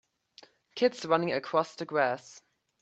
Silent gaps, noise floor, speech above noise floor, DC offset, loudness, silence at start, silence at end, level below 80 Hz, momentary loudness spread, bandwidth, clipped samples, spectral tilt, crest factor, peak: none; -59 dBFS; 30 dB; under 0.1%; -30 LUFS; 0.75 s; 0.45 s; -78 dBFS; 7 LU; 8.4 kHz; under 0.1%; -5 dB/octave; 22 dB; -10 dBFS